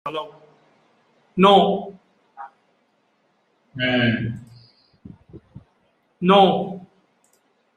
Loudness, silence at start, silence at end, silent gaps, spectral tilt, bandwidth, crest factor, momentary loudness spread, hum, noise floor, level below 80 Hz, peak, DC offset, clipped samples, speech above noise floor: -19 LUFS; 0.05 s; 1 s; none; -7 dB/octave; 9.6 kHz; 22 dB; 27 LU; none; -65 dBFS; -60 dBFS; -2 dBFS; under 0.1%; under 0.1%; 48 dB